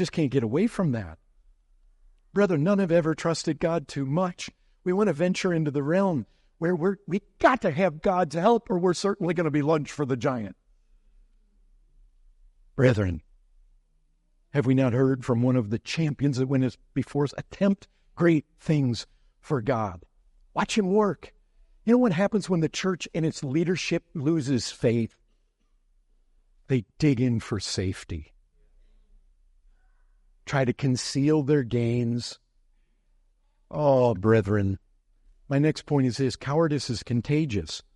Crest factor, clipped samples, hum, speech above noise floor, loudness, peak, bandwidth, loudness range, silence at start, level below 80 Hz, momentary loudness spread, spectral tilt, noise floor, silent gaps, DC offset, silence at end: 20 dB; under 0.1%; none; 42 dB; -26 LUFS; -6 dBFS; 11.5 kHz; 5 LU; 0 s; -56 dBFS; 10 LU; -6.5 dB/octave; -67 dBFS; none; under 0.1%; 0.15 s